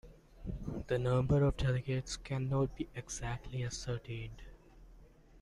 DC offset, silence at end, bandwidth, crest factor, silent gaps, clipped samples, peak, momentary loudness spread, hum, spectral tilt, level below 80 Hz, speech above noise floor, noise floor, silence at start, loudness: under 0.1%; 0 s; 11.5 kHz; 16 dB; none; under 0.1%; -20 dBFS; 14 LU; none; -6 dB/octave; -48 dBFS; 24 dB; -59 dBFS; 0.05 s; -36 LUFS